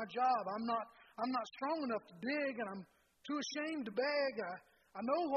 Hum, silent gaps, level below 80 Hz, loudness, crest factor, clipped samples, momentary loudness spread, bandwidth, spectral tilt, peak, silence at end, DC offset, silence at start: none; none; -84 dBFS; -39 LUFS; 16 dB; under 0.1%; 12 LU; 9.8 kHz; -4 dB/octave; -24 dBFS; 0 s; under 0.1%; 0 s